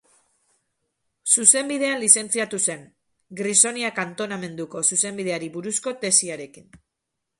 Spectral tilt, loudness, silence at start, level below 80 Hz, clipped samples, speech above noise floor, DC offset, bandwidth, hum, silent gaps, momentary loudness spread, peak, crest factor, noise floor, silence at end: -1.5 dB/octave; -20 LUFS; 1.25 s; -70 dBFS; under 0.1%; 58 dB; under 0.1%; 12 kHz; none; none; 16 LU; 0 dBFS; 24 dB; -81 dBFS; 0.65 s